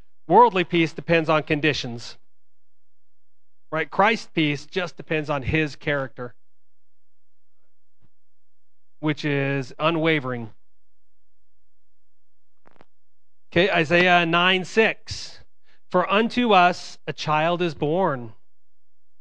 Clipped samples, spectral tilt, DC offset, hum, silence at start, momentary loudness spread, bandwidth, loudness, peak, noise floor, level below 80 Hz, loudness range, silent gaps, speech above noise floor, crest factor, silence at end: under 0.1%; -5.5 dB/octave; 1%; none; 0.3 s; 16 LU; 9.8 kHz; -21 LUFS; -2 dBFS; -84 dBFS; -54 dBFS; 10 LU; none; 63 dB; 22 dB; 0.9 s